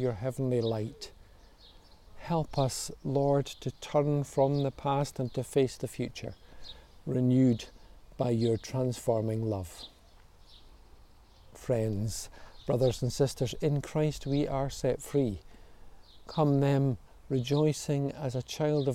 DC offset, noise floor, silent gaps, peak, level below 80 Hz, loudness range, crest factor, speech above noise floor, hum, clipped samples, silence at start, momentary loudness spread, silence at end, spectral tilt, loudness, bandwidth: under 0.1%; -56 dBFS; none; -14 dBFS; -52 dBFS; 4 LU; 16 dB; 27 dB; none; under 0.1%; 0 s; 16 LU; 0 s; -6.5 dB/octave; -31 LUFS; 15.5 kHz